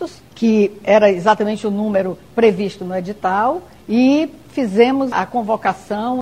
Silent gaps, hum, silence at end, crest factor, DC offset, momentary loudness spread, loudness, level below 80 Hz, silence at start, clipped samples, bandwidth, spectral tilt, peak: none; none; 0 s; 16 dB; 0.2%; 9 LU; -17 LUFS; -52 dBFS; 0 s; under 0.1%; 12.5 kHz; -6.5 dB/octave; 0 dBFS